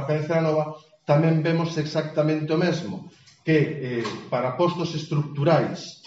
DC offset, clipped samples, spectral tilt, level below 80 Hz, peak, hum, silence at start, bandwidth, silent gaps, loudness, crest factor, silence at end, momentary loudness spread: under 0.1%; under 0.1%; -6 dB/octave; -66 dBFS; -6 dBFS; none; 0 s; 7.8 kHz; none; -24 LUFS; 18 dB; 0.1 s; 9 LU